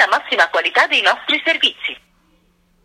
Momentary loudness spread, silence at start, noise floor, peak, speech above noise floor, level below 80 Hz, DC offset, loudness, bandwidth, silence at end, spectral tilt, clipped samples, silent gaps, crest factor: 12 LU; 0 s; -58 dBFS; 0 dBFS; 41 dB; -64 dBFS; under 0.1%; -15 LUFS; 16 kHz; 0.9 s; 0 dB/octave; under 0.1%; none; 18 dB